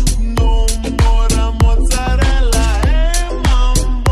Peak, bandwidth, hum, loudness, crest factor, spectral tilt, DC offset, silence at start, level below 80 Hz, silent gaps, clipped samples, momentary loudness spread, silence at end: 0 dBFS; 13.5 kHz; none; -15 LUFS; 10 dB; -4.5 dB/octave; under 0.1%; 0 s; -12 dBFS; none; under 0.1%; 3 LU; 0 s